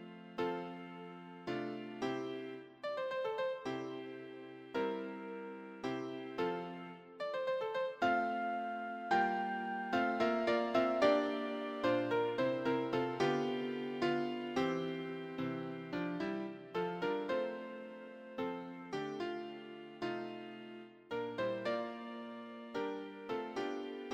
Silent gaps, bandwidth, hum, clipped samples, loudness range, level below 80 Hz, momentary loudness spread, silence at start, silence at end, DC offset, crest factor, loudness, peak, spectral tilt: none; 15 kHz; none; under 0.1%; 8 LU; -76 dBFS; 14 LU; 0 s; 0 s; under 0.1%; 22 dB; -38 LUFS; -18 dBFS; -6 dB/octave